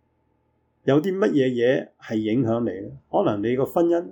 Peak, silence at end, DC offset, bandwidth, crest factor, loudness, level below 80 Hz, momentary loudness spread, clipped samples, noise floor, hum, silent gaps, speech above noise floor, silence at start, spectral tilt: -8 dBFS; 0 s; under 0.1%; 18 kHz; 14 dB; -23 LUFS; -62 dBFS; 8 LU; under 0.1%; -68 dBFS; none; none; 46 dB; 0.85 s; -8 dB/octave